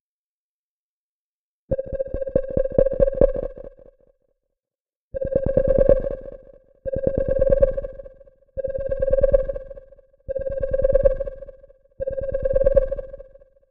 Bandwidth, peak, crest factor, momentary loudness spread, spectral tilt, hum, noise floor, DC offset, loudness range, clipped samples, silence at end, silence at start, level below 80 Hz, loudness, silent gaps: 2.9 kHz; -2 dBFS; 22 dB; 19 LU; -11.5 dB/octave; none; under -90 dBFS; under 0.1%; 3 LU; under 0.1%; 0.5 s; 1.7 s; -30 dBFS; -22 LUFS; 4.81-4.85 s, 4.96-5.11 s